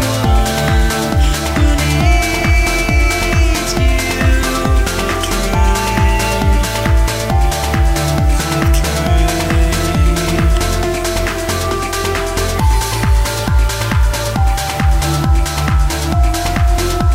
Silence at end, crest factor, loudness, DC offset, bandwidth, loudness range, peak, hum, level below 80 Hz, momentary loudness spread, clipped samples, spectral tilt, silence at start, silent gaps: 0 s; 12 dB; -15 LUFS; under 0.1%; 16.5 kHz; 2 LU; -2 dBFS; none; -16 dBFS; 3 LU; under 0.1%; -4.5 dB/octave; 0 s; none